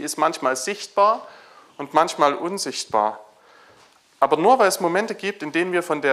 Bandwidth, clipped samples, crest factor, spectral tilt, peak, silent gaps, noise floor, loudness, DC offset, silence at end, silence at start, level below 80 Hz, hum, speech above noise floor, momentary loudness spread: 16 kHz; under 0.1%; 20 dB; -3 dB/octave; -2 dBFS; none; -54 dBFS; -21 LUFS; under 0.1%; 0 s; 0 s; -72 dBFS; none; 34 dB; 10 LU